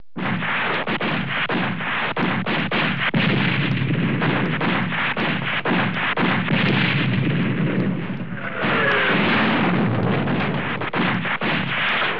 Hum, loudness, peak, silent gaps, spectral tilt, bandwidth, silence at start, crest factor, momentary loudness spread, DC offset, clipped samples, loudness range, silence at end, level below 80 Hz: none; -20 LUFS; -6 dBFS; none; -8.5 dB/octave; 5.4 kHz; 0.15 s; 14 dB; 5 LU; 2%; under 0.1%; 1 LU; 0 s; -60 dBFS